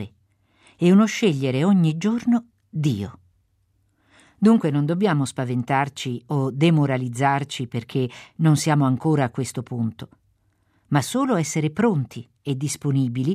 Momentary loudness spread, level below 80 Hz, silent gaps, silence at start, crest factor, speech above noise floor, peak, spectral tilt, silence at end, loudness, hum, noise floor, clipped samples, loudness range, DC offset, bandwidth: 11 LU; -64 dBFS; none; 0 s; 16 dB; 45 dB; -6 dBFS; -6.5 dB/octave; 0 s; -22 LUFS; none; -66 dBFS; under 0.1%; 3 LU; under 0.1%; 14.5 kHz